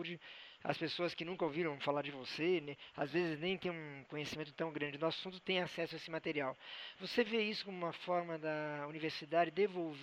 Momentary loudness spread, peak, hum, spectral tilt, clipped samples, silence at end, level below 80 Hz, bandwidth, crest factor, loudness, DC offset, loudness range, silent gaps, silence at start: 9 LU; -18 dBFS; none; -5.5 dB/octave; under 0.1%; 0 s; -80 dBFS; 13 kHz; 22 dB; -40 LUFS; under 0.1%; 2 LU; none; 0 s